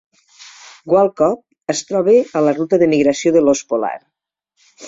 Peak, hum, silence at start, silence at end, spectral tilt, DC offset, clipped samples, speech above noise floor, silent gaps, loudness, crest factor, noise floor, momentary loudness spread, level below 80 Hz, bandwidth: -2 dBFS; none; 0.4 s; 0 s; -5 dB/octave; under 0.1%; under 0.1%; 56 dB; none; -16 LUFS; 14 dB; -71 dBFS; 11 LU; -58 dBFS; 7.8 kHz